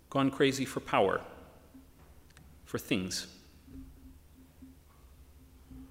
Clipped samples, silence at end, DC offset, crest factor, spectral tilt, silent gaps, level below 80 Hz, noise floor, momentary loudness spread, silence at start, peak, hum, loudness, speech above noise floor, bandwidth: under 0.1%; 0.05 s; under 0.1%; 24 dB; -4.5 dB/octave; none; -58 dBFS; -57 dBFS; 26 LU; 0.1 s; -12 dBFS; none; -32 LUFS; 26 dB; 16 kHz